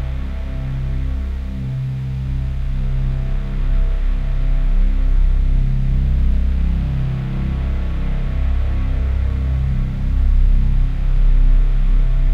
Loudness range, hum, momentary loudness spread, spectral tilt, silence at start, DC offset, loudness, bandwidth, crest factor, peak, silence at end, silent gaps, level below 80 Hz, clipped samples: 4 LU; none; 5 LU; -8.5 dB/octave; 0 s; under 0.1%; -21 LUFS; 4 kHz; 10 dB; -4 dBFS; 0 s; none; -16 dBFS; under 0.1%